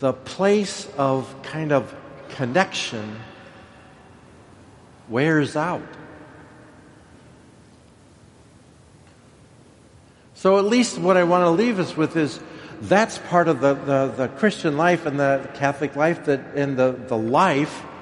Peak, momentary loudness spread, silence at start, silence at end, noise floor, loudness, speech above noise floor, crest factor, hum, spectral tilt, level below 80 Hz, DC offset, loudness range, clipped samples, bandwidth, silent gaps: -2 dBFS; 14 LU; 0 s; 0 s; -50 dBFS; -21 LUFS; 30 dB; 20 dB; none; -5.5 dB/octave; -60 dBFS; under 0.1%; 7 LU; under 0.1%; 11.5 kHz; none